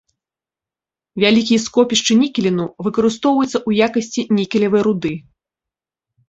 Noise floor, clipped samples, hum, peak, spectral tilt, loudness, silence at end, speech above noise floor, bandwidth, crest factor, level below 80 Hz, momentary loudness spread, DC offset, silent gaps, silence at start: -89 dBFS; under 0.1%; none; -2 dBFS; -4.5 dB/octave; -16 LUFS; 1.1 s; 73 dB; 8 kHz; 16 dB; -56 dBFS; 7 LU; under 0.1%; none; 1.15 s